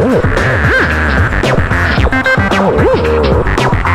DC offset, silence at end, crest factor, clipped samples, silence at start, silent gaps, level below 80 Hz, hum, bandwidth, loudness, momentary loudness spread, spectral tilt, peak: under 0.1%; 0 s; 10 dB; under 0.1%; 0 s; none; -18 dBFS; none; 14 kHz; -11 LUFS; 2 LU; -6.5 dB/octave; 0 dBFS